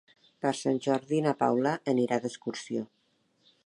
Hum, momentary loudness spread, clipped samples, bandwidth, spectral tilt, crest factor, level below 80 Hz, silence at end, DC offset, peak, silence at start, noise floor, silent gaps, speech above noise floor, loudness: none; 10 LU; under 0.1%; 11 kHz; -5.5 dB/octave; 20 dB; -80 dBFS; 0.8 s; under 0.1%; -10 dBFS; 0.45 s; -71 dBFS; none; 43 dB; -30 LUFS